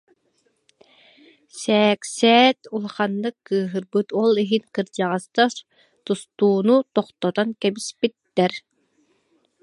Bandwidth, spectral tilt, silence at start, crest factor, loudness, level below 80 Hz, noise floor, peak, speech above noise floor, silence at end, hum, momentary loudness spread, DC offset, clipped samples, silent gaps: 11.5 kHz; -4.5 dB/octave; 1.55 s; 20 dB; -21 LUFS; -74 dBFS; -67 dBFS; -2 dBFS; 47 dB; 1.05 s; none; 11 LU; under 0.1%; under 0.1%; none